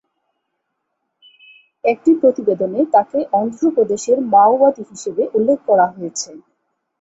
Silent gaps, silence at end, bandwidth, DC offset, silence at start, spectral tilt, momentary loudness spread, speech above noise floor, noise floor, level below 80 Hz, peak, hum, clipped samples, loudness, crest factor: none; 0.65 s; 8.2 kHz; under 0.1%; 1.85 s; -5 dB/octave; 13 LU; 58 dB; -74 dBFS; -64 dBFS; -2 dBFS; none; under 0.1%; -16 LUFS; 16 dB